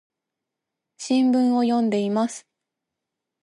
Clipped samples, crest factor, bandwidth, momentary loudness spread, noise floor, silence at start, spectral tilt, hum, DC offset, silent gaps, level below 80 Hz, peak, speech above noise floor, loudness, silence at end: under 0.1%; 14 dB; 11.5 kHz; 13 LU; -84 dBFS; 1 s; -5.5 dB/octave; none; under 0.1%; none; -76 dBFS; -10 dBFS; 64 dB; -21 LUFS; 1.05 s